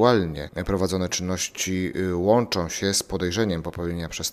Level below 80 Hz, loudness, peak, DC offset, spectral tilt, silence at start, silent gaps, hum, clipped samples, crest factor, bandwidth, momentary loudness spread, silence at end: -44 dBFS; -25 LUFS; -2 dBFS; under 0.1%; -4.5 dB/octave; 0 s; none; none; under 0.1%; 22 dB; 16 kHz; 9 LU; 0 s